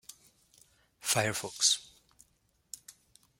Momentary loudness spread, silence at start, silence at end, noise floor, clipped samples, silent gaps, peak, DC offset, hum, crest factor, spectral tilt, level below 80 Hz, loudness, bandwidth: 21 LU; 1.05 s; 0.5 s; -73 dBFS; under 0.1%; none; -12 dBFS; under 0.1%; none; 26 dB; -1 dB/octave; -72 dBFS; -29 LUFS; 16.5 kHz